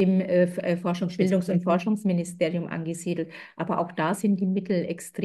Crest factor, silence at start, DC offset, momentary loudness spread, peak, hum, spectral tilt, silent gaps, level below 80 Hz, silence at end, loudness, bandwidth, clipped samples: 16 dB; 0 s; under 0.1%; 8 LU; -10 dBFS; none; -7 dB/octave; none; -70 dBFS; 0 s; -26 LUFS; 12.5 kHz; under 0.1%